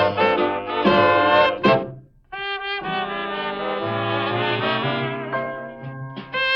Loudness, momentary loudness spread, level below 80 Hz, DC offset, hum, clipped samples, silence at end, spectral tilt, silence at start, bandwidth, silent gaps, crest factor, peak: -21 LUFS; 17 LU; -54 dBFS; under 0.1%; none; under 0.1%; 0 s; -7 dB/octave; 0 s; 7.2 kHz; none; 16 dB; -6 dBFS